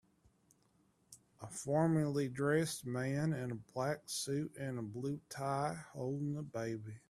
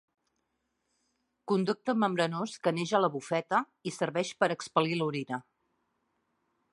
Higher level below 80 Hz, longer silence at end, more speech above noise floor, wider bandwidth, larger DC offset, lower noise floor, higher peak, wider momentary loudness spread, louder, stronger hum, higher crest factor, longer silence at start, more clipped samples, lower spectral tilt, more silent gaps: first, -72 dBFS vs -80 dBFS; second, 0.1 s vs 1.3 s; second, 36 dB vs 50 dB; first, 14 kHz vs 11.5 kHz; neither; second, -74 dBFS vs -80 dBFS; second, -20 dBFS vs -10 dBFS; about the same, 9 LU vs 8 LU; second, -38 LUFS vs -31 LUFS; neither; about the same, 20 dB vs 22 dB; second, 1.1 s vs 1.45 s; neither; about the same, -5.5 dB/octave vs -5.5 dB/octave; neither